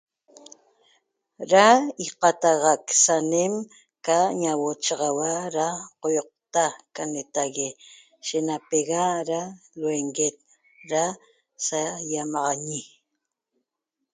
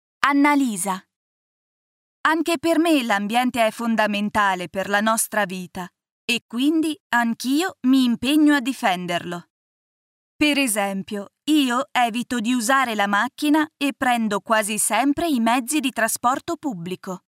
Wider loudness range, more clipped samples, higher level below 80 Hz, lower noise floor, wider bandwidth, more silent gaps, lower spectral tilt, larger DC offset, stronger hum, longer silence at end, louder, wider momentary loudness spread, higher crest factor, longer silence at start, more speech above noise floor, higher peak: first, 7 LU vs 2 LU; neither; second, -76 dBFS vs -62 dBFS; second, -83 dBFS vs under -90 dBFS; second, 9.6 kHz vs 16 kHz; second, none vs 1.16-2.24 s, 6.11-6.28 s, 6.42-6.49 s, 7.00-7.10 s, 9.50-10.39 s; about the same, -2.5 dB/octave vs -3 dB/octave; neither; neither; first, 1.25 s vs 0.1 s; second, -24 LUFS vs -21 LUFS; first, 13 LU vs 10 LU; about the same, 22 dB vs 22 dB; first, 1.4 s vs 0.2 s; second, 59 dB vs over 69 dB; second, -4 dBFS vs 0 dBFS